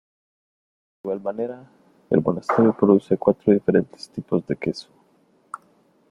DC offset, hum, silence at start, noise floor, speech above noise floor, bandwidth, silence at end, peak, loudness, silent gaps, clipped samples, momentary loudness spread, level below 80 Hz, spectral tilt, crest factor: under 0.1%; none; 1.05 s; -60 dBFS; 40 dB; 11 kHz; 0.55 s; -2 dBFS; -21 LUFS; none; under 0.1%; 21 LU; -60 dBFS; -8.5 dB/octave; 20 dB